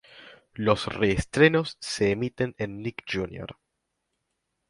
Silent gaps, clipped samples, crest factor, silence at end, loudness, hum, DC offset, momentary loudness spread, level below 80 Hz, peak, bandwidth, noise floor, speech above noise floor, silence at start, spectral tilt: none; under 0.1%; 24 dB; 1.15 s; -26 LUFS; none; under 0.1%; 15 LU; -50 dBFS; -4 dBFS; 11.5 kHz; -80 dBFS; 54 dB; 0.15 s; -5.5 dB/octave